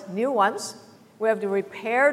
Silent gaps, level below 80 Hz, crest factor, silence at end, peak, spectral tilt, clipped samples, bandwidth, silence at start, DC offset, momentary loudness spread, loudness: none; -80 dBFS; 18 dB; 0 s; -8 dBFS; -4 dB/octave; under 0.1%; 15.5 kHz; 0 s; under 0.1%; 9 LU; -25 LUFS